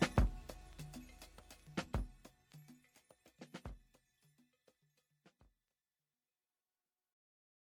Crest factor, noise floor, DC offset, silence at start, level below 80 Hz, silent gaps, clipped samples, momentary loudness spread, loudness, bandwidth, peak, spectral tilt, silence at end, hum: 28 dB; under -90 dBFS; under 0.1%; 0 s; -50 dBFS; none; under 0.1%; 22 LU; -45 LUFS; 18.5 kHz; -18 dBFS; -5.5 dB/octave; 4.05 s; none